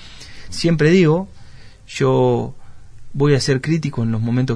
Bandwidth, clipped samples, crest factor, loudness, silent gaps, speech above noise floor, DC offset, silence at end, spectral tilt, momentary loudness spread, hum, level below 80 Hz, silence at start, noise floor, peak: 10.5 kHz; under 0.1%; 16 dB; -17 LUFS; none; 22 dB; under 0.1%; 0 s; -6.5 dB/octave; 18 LU; none; -42 dBFS; 0 s; -38 dBFS; -2 dBFS